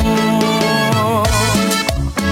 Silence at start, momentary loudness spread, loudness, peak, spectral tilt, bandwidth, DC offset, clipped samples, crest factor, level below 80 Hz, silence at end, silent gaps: 0 s; 3 LU; -15 LUFS; -2 dBFS; -4.5 dB/octave; 17 kHz; under 0.1%; under 0.1%; 12 dB; -26 dBFS; 0 s; none